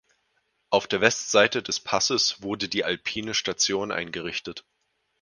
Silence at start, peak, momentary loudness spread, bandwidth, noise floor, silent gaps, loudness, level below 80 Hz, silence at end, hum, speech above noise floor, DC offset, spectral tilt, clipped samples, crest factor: 0.7 s; 0 dBFS; 10 LU; 11 kHz; -72 dBFS; none; -24 LUFS; -62 dBFS; 0.6 s; none; 47 dB; under 0.1%; -2 dB/octave; under 0.1%; 26 dB